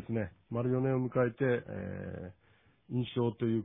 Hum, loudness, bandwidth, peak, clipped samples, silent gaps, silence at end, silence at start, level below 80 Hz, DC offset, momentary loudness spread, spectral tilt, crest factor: none; -34 LUFS; 3.8 kHz; -16 dBFS; under 0.1%; none; 0 s; 0 s; -64 dBFS; under 0.1%; 12 LU; -6.5 dB/octave; 16 dB